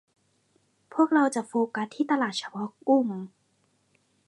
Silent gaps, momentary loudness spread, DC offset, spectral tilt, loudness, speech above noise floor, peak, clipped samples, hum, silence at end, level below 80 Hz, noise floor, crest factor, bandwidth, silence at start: none; 13 LU; under 0.1%; -5 dB/octave; -26 LUFS; 44 dB; -10 dBFS; under 0.1%; none; 1 s; -82 dBFS; -70 dBFS; 18 dB; 11.5 kHz; 0.9 s